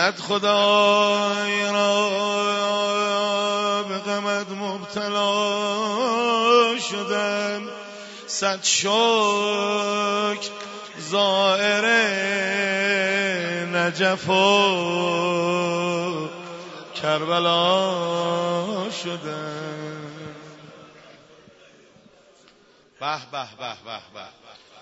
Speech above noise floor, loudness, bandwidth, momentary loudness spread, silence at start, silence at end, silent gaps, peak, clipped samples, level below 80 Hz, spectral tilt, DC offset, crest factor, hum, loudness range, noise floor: 33 dB; -21 LUFS; 8 kHz; 17 LU; 0 s; 0 s; none; -4 dBFS; under 0.1%; -74 dBFS; -3 dB/octave; under 0.1%; 20 dB; none; 15 LU; -55 dBFS